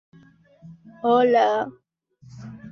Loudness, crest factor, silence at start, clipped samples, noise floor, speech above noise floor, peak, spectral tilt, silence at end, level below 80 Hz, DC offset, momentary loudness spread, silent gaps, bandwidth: -21 LUFS; 18 dB; 0.65 s; under 0.1%; -53 dBFS; 32 dB; -8 dBFS; -6 dB/octave; 0 s; -66 dBFS; under 0.1%; 24 LU; none; 6.8 kHz